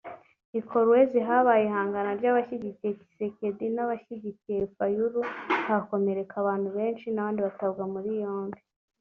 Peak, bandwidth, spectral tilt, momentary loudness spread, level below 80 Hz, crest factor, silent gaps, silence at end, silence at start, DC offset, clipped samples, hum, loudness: -8 dBFS; 6 kHz; -5.5 dB/octave; 13 LU; -68 dBFS; 18 dB; 0.45-0.53 s; 0.45 s; 0.05 s; under 0.1%; under 0.1%; none; -28 LUFS